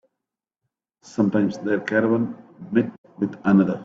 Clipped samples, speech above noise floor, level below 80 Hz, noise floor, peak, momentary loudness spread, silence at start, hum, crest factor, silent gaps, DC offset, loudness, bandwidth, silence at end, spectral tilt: under 0.1%; 64 dB; -62 dBFS; -85 dBFS; -6 dBFS; 11 LU; 1.15 s; none; 18 dB; 2.98-3.04 s; under 0.1%; -22 LUFS; 7.6 kHz; 0 s; -8 dB/octave